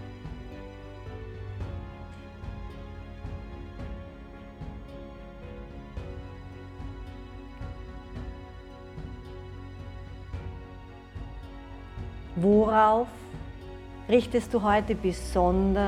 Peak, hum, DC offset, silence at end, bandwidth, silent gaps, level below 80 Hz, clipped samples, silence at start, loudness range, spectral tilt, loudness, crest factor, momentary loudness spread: -10 dBFS; none; under 0.1%; 0 s; 13 kHz; none; -42 dBFS; under 0.1%; 0 s; 17 LU; -7 dB/octave; -28 LUFS; 22 dB; 20 LU